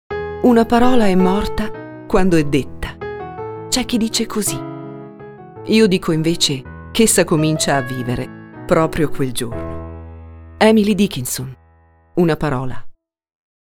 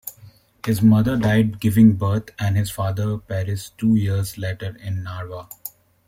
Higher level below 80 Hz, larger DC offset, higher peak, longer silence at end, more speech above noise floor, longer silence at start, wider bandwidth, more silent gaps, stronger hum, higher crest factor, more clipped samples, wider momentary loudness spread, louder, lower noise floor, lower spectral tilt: first, -34 dBFS vs -48 dBFS; neither; about the same, 0 dBFS vs -2 dBFS; first, 0.85 s vs 0.4 s; first, 36 dB vs 29 dB; about the same, 0.1 s vs 0.05 s; about the same, 18 kHz vs 16.5 kHz; neither; neither; about the same, 18 dB vs 18 dB; neither; about the same, 19 LU vs 18 LU; first, -17 LUFS vs -20 LUFS; about the same, -51 dBFS vs -48 dBFS; second, -4.5 dB/octave vs -7 dB/octave